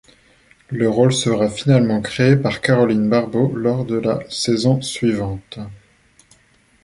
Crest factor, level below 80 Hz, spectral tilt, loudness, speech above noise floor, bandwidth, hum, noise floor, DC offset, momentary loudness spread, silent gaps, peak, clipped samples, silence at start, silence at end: 18 dB; -50 dBFS; -6 dB/octave; -18 LUFS; 39 dB; 11.5 kHz; none; -56 dBFS; under 0.1%; 11 LU; none; -2 dBFS; under 0.1%; 0.7 s; 1.05 s